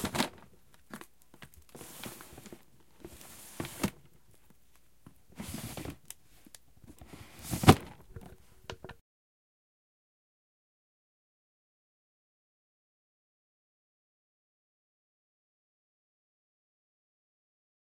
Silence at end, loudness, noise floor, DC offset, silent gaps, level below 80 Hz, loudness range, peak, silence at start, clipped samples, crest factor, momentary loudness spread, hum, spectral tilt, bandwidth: 8.9 s; -32 LUFS; -68 dBFS; 0.1%; none; -58 dBFS; 19 LU; -2 dBFS; 0 s; under 0.1%; 38 dB; 28 LU; none; -5 dB/octave; 16.5 kHz